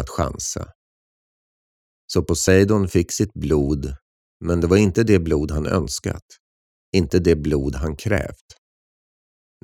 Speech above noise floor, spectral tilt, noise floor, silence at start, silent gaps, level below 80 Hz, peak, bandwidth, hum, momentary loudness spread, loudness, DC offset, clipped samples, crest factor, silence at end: over 70 dB; -5.5 dB/octave; under -90 dBFS; 0 s; 0.75-2.08 s, 4.02-4.40 s, 6.22-6.29 s, 6.40-6.93 s; -36 dBFS; -2 dBFS; 16 kHz; none; 14 LU; -20 LUFS; under 0.1%; under 0.1%; 18 dB; 1.3 s